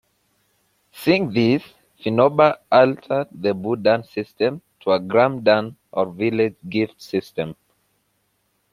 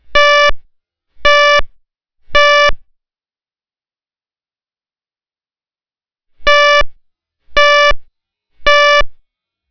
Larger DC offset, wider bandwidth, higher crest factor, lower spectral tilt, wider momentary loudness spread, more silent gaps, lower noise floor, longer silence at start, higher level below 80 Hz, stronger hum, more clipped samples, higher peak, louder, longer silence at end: neither; first, 15 kHz vs 5.4 kHz; first, 20 dB vs 14 dB; first, -7 dB/octave vs -1 dB/octave; about the same, 12 LU vs 10 LU; neither; second, -68 dBFS vs under -90 dBFS; first, 0.95 s vs 0.05 s; second, -62 dBFS vs -30 dBFS; first, 50 Hz at -55 dBFS vs none; second, under 0.1% vs 2%; about the same, -2 dBFS vs 0 dBFS; second, -20 LUFS vs -10 LUFS; first, 1.2 s vs 0.55 s